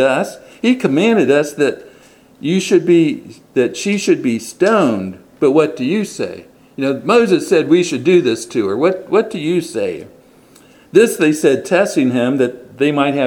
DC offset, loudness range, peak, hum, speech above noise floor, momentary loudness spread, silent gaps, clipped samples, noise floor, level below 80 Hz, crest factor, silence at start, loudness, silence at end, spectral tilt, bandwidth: under 0.1%; 2 LU; 0 dBFS; none; 32 dB; 10 LU; none; under 0.1%; -46 dBFS; -60 dBFS; 14 dB; 0 s; -15 LUFS; 0 s; -5.5 dB/octave; 18 kHz